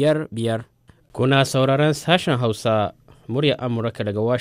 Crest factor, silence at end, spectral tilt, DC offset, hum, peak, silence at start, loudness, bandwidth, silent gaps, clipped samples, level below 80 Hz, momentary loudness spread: 18 dB; 0 s; -6 dB/octave; under 0.1%; none; -2 dBFS; 0 s; -21 LUFS; 15.5 kHz; none; under 0.1%; -56 dBFS; 8 LU